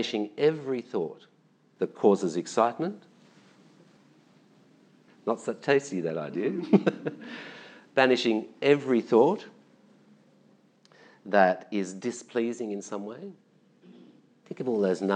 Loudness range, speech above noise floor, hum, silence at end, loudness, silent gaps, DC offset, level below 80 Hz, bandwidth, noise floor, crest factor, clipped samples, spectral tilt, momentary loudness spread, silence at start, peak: 7 LU; 35 dB; none; 0 s; -27 LUFS; none; under 0.1%; under -90 dBFS; 9.6 kHz; -61 dBFS; 24 dB; under 0.1%; -5.5 dB/octave; 18 LU; 0 s; -4 dBFS